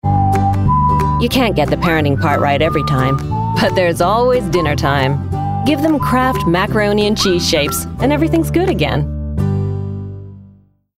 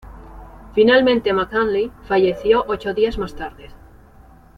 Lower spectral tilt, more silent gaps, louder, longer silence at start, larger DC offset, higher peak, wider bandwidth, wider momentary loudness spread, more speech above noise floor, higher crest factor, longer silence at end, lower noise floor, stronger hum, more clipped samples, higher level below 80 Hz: about the same, -6 dB/octave vs -6.5 dB/octave; neither; first, -15 LUFS vs -18 LUFS; about the same, 0.05 s vs 0.05 s; neither; about the same, -2 dBFS vs -2 dBFS; first, 16 kHz vs 7.2 kHz; second, 6 LU vs 14 LU; first, 33 dB vs 28 dB; second, 12 dB vs 18 dB; second, 0.55 s vs 0.85 s; about the same, -47 dBFS vs -46 dBFS; first, 50 Hz at -40 dBFS vs none; neither; first, -28 dBFS vs -42 dBFS